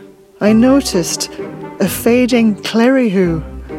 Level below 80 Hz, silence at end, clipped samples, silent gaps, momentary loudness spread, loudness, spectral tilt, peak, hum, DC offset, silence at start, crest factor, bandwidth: -36 dBFS; 0 s; under 0.1%; none; 11 LU; -13 LUFS; -5 dB/octave; 0 dBFS; none; under 0.1%; 0 s; 14 dB; 16.5 kHz